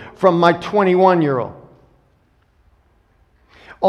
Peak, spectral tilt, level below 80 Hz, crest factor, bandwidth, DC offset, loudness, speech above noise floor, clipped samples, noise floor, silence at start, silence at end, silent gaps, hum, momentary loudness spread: 0 dBFS; -7.5 dB/octave; -56 dBFS; 18 dB; 9.2 kHz; under 0.1%; -15 LUFS; 44 dB; under 0.1%; -58 dBFS; 0 s; 0 s; none; none; 9 LU